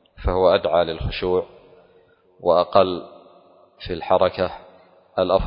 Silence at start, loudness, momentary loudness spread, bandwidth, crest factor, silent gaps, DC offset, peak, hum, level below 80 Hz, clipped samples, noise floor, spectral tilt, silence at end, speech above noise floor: 0.2 s; -21 LUFS; 15 LU; 5.4 kHz; 20 dB; none; under 0.1%; -2 dBFS; none; -38 dBFS; under 0.1%; -56 dBFS; -10.5 dB/octave; 0 s; 36 dB